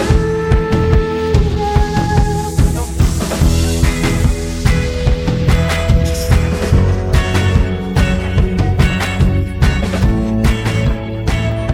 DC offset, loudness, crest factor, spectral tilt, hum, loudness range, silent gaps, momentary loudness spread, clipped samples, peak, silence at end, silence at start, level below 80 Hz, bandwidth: under 0.1%; -15 LUFS; 14 dB; -6 dB/octave; none; 1 LU; none; 3 LU; under 0.1%; 0 dBFS; 0 s; 0 s; -18 dBFS; 16.5 kHz